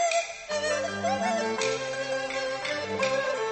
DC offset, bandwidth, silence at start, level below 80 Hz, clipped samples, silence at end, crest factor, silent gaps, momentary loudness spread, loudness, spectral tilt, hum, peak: under 0.1%; 8.8 kHz; 0 s; -64 dBFS; under 0.1%; 0 s; 16 dB; none; 4 LU; -28 LUFS; -2.5 dB/octave; none; -12 dBFS